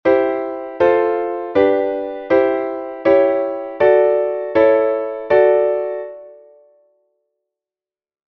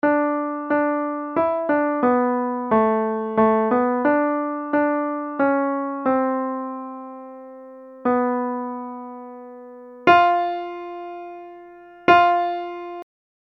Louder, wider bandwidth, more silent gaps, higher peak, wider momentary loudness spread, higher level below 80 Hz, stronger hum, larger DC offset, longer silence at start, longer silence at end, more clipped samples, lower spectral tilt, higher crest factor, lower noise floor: first, -16 LUFS vs -21 LUFS; about the same, 5.8 kHz vs 6.2 kHz; neither; about the same, -2 dBFS vs 0 dBFS; second, 11 LU vs 22 LU; first, -56 dBFS vs -62 dBFS; neither; neither; about the same, 0.05 s vs 0.05 s; first, 2.05 s vs 0.4 s; neither; about the same, -7.5 dB/octave vs -7.5 dB/octave; about the same, 16 dB vs 20 dB; first, under -90 dBFS vs -43 dBFS